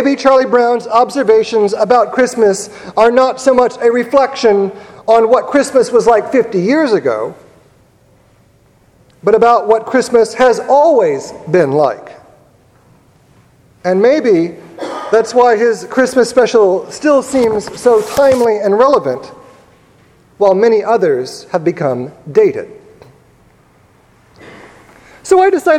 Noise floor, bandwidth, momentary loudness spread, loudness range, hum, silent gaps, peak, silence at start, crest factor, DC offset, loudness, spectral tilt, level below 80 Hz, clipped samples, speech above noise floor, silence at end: -49 dBFS; 14.5 kHz; 10 LU; 6 LU; none; none; 0 dBFS; 0 s; 12 dB; under 0.1%; -12 LUFS; -5 dB/octave; -52 dBFS; 0.1%; 38 dB; 0 s